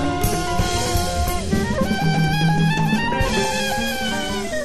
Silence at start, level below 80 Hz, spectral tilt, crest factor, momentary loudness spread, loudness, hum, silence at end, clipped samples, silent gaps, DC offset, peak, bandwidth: 0 s; -30 dBFS; -4.5 dB/octave; 12 dB; 4 LU; -20 LUFS; none; 0 s; under 0.1%; none; 2%; -8 dBFS; 13.5 kHz